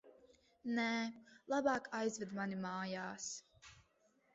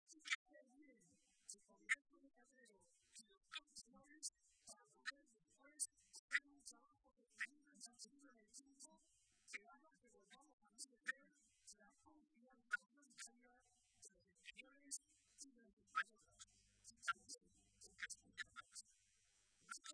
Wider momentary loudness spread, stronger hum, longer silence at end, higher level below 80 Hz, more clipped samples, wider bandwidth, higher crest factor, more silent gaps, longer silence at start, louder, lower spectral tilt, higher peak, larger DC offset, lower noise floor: about the same, 19 LU vs 20 LU; neither; first, 0.55 s vs 0 s; first, -80 dBFS vs under -90 dBFS; neither; second, 8 kHz vs 11 kHz; second, 20 dB vs 30 dB; second, none vs 0.35-0.46 s, 3.37-3.41 s, 6.19-6.28 s, 10.53-10.58 s, 15.73-15.77 s; about the same, 0.05 s vs 0.1 s; first, -41 LUFS vs -52 LUFS; first, -3.5 dB/octave vs 1.5 dB/octave; first, -22 dBFS vs -26 dBFS; neither; second, -76 dBFS vs -80 dBFS